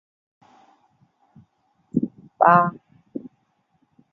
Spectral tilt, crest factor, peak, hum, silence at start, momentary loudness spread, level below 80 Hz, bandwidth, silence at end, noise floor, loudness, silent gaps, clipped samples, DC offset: -10 dB/octave; 24 dB; -2 dBFS; none; 1.95 s; 22 LU; -68 dBFS; 5.8 kHz; 0.95 s; -68 dBFS; -20 LUFS; none; under 0.1%; under 0.1%